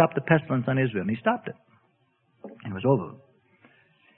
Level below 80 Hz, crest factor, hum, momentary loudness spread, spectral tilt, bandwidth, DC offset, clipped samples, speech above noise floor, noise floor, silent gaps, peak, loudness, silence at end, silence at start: -66 dBFS; 22 dB; none; 21 LU; -11.5 dB/octave; 4 kHz; under 0.1%; under 0.1%; 43 dB; -68 dBFS; none; -6 dBFS; -26 LUFS; 1.05 s; 0 s